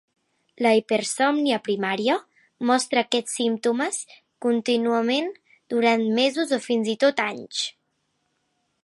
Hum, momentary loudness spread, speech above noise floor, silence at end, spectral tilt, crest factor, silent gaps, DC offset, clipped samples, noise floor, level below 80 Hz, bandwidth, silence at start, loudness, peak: none; 8 LU; 51 dB; 1.15 s; -3 dB/octave; 18 dB; none; under 0.1%; under 0.1%; -73 dBFS; -78 dBFS; 11.5 kHz; 0.6 s; -23 LUFS; -6 dBFS